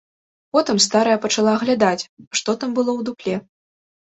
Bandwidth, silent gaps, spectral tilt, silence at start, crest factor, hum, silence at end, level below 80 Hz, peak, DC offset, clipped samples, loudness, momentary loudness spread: 8.4 kHz; 2.09-2.17 s, 2.27-2.31 s; -3.5 dB/octave; 0.55 s; 18 dB; none; 0.75 s; -62 dBFS; -2 dBFS; under 0.1%; under 0.1%; -19 LUFS; 10 LU